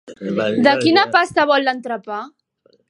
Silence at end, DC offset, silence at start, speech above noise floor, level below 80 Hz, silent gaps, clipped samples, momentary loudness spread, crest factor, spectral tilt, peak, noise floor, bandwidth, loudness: 0.6 s; under 0.1%; 0.05 s; 42 dB; -62 dBFS; none; under 0.1%; 15 LU; 18 dB; -5 dB/octave; 0 dBFS; -59 dBFS; 11.5 kHz; -16 LUFS